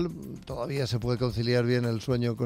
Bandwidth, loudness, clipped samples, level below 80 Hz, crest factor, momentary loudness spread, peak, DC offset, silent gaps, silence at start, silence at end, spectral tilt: 15.5 kHz; -29 LUFS; under 0.1%; -50 dBFS; 14 dB; 10 LU; -14 dBFS; under 0.1%; none; 0 s; 0 s; -7 dB/octave